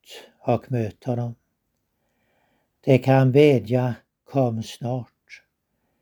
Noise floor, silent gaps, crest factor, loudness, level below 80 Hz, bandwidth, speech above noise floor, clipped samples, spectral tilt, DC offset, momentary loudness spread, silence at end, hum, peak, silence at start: -74 dBFS; none; 22 dB; -22 LUFS; -64 dBFS; 19 kHz; 54 dB; under 0.1%; -8 dB/octave; under 0.1%; 16 LU; 0.65 s; none; -2 dBFS; 0.1 s